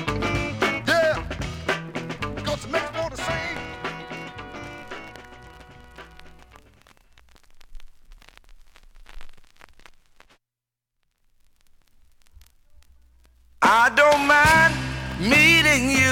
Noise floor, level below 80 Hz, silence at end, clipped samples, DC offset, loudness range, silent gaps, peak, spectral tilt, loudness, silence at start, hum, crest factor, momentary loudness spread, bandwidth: -87 dBFS; -44 dBFS; 0 s; under 0.1%; under 0.1%; 23 LU; none; -6 dBFS; -3.5 dB/octave; -20 LUFS; 0 s; none; 20 dB; 22 LU; 17.5 kHz